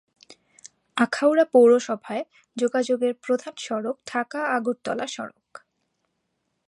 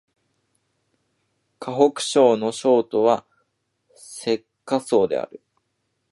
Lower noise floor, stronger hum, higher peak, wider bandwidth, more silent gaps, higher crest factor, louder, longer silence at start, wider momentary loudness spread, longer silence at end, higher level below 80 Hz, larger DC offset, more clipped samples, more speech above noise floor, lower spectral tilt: about the same, -76 dBFS vs -74 dBFS; neither; second, -6 dBFS vs -2 dBFS; about the same, 11.5 kHz vs 11.5 kHz; neither; about the same, 20 dB vs 20 dB; about the same, -23 LUFS vs -21 LUFS; second, 0.95 s vs 1.6 s; about the same, 15 LU vs 13 LU; first, 1.4 s vs 0.85 s; second, -78 dBFS vs -70 dBFS; neither; neither; about the same, 53 dB vs 54 dB; about the same, -4 dB/octave vs -4.5 dB/octave